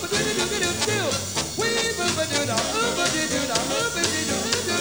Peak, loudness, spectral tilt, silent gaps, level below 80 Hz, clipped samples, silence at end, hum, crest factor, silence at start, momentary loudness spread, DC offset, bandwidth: -4 dBFS; -23 LUFS; -2 dB/octave; none; -50 dBFS; under 0.1%; 0 s; none; 20 dB; 0 s; 2 LU; 0.2%; over 20 kHz